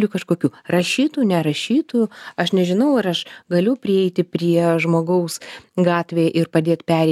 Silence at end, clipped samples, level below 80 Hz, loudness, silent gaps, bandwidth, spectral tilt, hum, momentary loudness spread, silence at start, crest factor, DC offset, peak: 0 s; under 0.1%; -66 dBFS; -19 LUFS; none; 14.5 kHz; -6 dB/octave; none; 5 LU; 0 s; 16 dB; under 0.1%; -2 dBFS